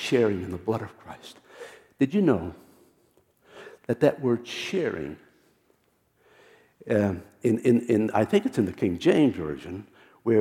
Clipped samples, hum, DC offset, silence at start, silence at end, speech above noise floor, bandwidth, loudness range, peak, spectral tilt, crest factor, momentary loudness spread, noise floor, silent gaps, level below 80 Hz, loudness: under 0.1%; none; under 0.1%; 0 s; 0 s; 43 dB; 15.5 kHz; 6 LU; -6 dBFS; -7 dB/octave; 20 dB; 22 LU; -68 dBFS; none; -60 dBFS; -25 LUFS